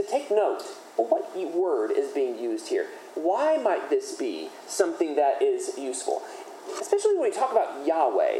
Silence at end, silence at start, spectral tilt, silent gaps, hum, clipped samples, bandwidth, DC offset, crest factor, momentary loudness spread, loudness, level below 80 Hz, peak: 0 s; 0 s; -2 dB/octave; none; none; under 0.1%; 14 kHz; under 0.1%; 18 dB; 9 LU; -26 LUFS; under -90 dBFS; -8 dBFS